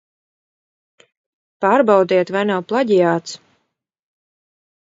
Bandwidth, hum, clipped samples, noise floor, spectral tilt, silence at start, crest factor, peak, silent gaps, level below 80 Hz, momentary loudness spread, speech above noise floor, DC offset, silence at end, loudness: 7.8 kHz; none; under 0.1%; -74 dBFS; -6 dB/octave; 1.6 s; 20 dB; 0 dBFS; none; -70 dBFS; 10 LU; 58 dB; under 0.1%; 1.6 s; -16 LUFS